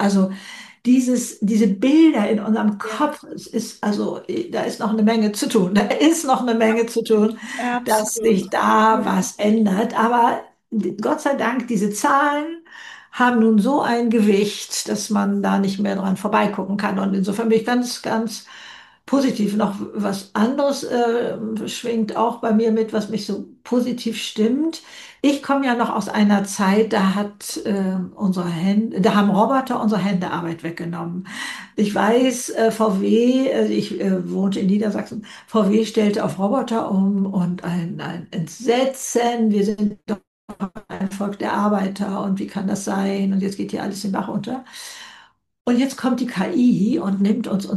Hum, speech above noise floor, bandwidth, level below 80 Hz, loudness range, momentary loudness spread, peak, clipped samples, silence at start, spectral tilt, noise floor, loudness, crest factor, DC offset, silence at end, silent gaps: none; 30 dB; 12.5 kHz; -62 dBFS; 4 LU; 11 LU; -4 dBFS; under 0.1%; 0 s; -5.5 dB/octave; -49 dBFS; -20 LUFS; 16 dB; under 0.1%; 0 s; 40.27-40.48 s, 45.61-45.65 s